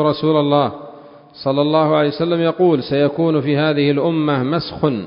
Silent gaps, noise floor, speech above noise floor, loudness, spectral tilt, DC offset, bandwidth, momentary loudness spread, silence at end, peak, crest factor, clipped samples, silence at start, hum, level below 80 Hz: none; -39 dBFS; 23 dB; -17 LUFS; -12 dB/octave; under 0.1%; 5.4 kHz; 6 LU; 0 s; -2 dBFS; 16 dB; under 0.1%; 0 s; none; -52 dBFS